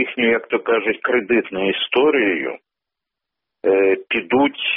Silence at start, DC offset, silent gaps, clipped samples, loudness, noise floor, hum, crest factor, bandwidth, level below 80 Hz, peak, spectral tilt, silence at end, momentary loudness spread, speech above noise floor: 0 s; under 0.1%; none; under 0.1%; -18 LUFS; -85 dBFS; none; 14 dB; 3.9 kHz; -60 dBFS; -6 dBFS; -1.5 dB/octave; 0 s; 6 LU; 67 dB